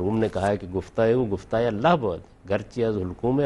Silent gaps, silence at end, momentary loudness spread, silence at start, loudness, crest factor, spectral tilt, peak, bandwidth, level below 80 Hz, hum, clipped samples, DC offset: none; 0 s; 8 LU; 0 s; -25 LUFS; 18 dB; -7.5 dB/octave; -6 dBFS; 11.5 kHz; -50 dBFS; none; under 0.1%; under 0.1%